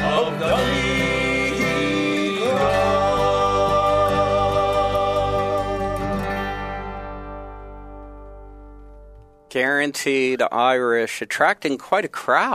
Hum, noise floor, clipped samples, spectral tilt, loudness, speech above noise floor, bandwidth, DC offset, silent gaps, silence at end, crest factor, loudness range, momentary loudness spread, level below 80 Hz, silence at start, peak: none; -45 dBFS; under 0.1%; -5 dB/octave; -20 LUFS; 25 dB; 15.5 kHz; under 0.1%; none; 0 s; 18 dB; 10 LU; 15 LU; -38 dBFS; 0 s; -4 dBFS